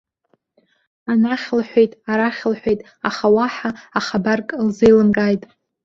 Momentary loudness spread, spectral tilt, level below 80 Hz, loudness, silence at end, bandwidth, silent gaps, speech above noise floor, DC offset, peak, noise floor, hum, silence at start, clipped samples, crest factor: 10 LU; -6.5 dB/octave; -52 dBFS; -18 LUFS; 0.45 s; 7.4 kHz; none; 48 dB; under 0.1%; -2 dBFS; -65 dBFS; none; 1.05 s; under 0.1%; 16 dB